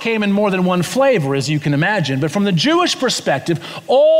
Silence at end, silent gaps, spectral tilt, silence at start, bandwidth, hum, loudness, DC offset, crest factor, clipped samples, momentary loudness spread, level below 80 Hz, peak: 0 s; none; -5 dB/octave; 0 s; 16 kHz; none; -16 LUFS; under 0.1%; 12 dB; under 0.1%; 4 LU; -60 dBFS; -4 dBFS